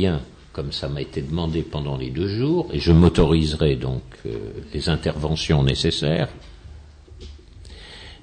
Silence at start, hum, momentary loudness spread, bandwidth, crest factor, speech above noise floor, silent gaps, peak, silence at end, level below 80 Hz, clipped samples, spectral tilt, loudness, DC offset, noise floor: 0 s; none; 22 LU; 9.4 kHz; 16 dB; 22 dB; none; -6 dBFS; 0.1 s; -34 dBFS; under 0.1%; -6.5 dB/octave; -22 LUFS; under 0.1%; -43 dBFS